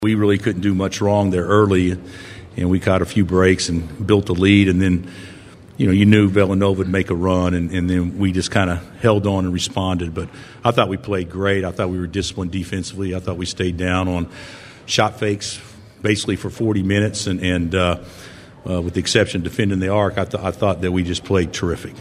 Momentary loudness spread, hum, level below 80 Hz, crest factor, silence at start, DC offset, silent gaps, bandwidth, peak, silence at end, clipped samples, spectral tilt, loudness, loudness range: 12 LU; none; -42 dBFS; 18 dB; 0 s; under 0.1%; none; 13.5 kHz; 0 dBFS; 0 s; under 0.1%; -6 dB/octave; -19 LUFS; 6 LU